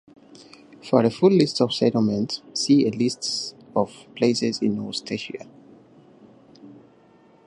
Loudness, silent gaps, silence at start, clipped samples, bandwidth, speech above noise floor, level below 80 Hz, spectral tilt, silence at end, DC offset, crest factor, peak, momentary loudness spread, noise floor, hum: -22 LUFS; none; 0.85 s; under 0.1%; 11 kHz; 33 dB; -66 dBFS; -5.5 dB/octave; 0.75 s; under 0.1%; 20 dB; -4 dBFS; 12 LU; -54 dBFS; none